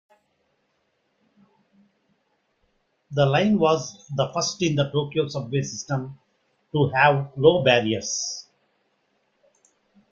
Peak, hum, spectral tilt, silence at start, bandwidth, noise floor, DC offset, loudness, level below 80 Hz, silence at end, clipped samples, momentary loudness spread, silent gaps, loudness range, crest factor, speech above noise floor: -4 dBFS; none; -4.5 dB/octave; 3.1 s; 7.6 kHz; -71 dBFS; under 0.1%; -22 LUFS; -60 dBFS; 1.7 s; under 0.1%; 12 LU; none; 4 LU; 22 dB; 49 dB